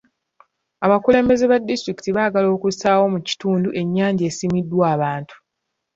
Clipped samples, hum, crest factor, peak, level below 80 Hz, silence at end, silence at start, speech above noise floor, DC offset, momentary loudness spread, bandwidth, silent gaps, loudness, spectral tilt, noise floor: under 0.1%; none; 16 dB; -2 dBFS; -54 dBFS; 0.6 s; 0.8 s; 60 dB; under 0.1%; 8 LU; 7.8 kHz; none; -19 LUFS; -6 dB/octave; -78 dBFS